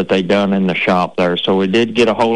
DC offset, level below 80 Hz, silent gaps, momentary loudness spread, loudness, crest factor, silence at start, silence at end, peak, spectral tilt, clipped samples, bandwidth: 0.8%; -48 dBFS; none; 2 LU; -14 LUFS; 10 dB; 0 s; 0 s; -4 dBFS; -6 dB/octave; under 0.1%; 10 kHz